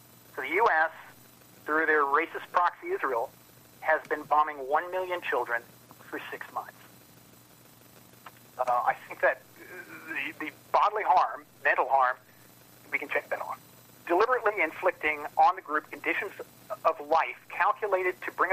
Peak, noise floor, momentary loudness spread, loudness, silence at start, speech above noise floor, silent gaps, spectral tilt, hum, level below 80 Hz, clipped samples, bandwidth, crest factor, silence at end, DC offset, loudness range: -10 dBFS; -55 dBFS; 15 LU; -28 LUFS; 0.35 s; 27 dB; none; -4 dB/octave; none; -74 dBFS; under 0.1%; 15.5 kHz; 20 dB; 0 s; under 0.1%; 6 LU